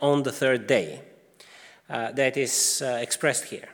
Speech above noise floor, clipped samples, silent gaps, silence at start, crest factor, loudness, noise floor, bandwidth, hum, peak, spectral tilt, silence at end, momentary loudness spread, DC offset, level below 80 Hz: 27 dB; under 0.1%; none; 0 s; 18 dB; -24 LUFS; -52 dBFS; over 20 kHz; none; -8 dBFS; -2.5 dB/octave; 0 s; 11 LU; under 0.1%; -76 dBFS